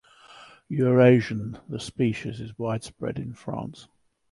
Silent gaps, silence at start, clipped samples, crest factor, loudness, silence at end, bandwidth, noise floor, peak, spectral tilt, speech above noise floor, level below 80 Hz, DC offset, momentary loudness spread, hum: none; 0.3 s; under 0.1%; 20 dB; -25 LUFS; 0.5 s; 11.5 kHz; -50 dBFS; -6 dBFS; -7.5 dB/octave; 26 dB; -58 dBFS; under 0.1%; 17 LU; none